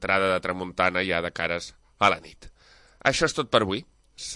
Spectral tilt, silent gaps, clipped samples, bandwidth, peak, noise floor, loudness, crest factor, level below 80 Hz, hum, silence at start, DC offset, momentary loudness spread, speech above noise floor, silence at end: -3.5 dB/octave; none; under 0.1%; 11.5 kHz; -4 dBFS; -55 dBFS; -25 LUFS; 22 dB; -52 dBFS; none; 0 s; under 0.1%; 10 LU; 29 dB; 0 s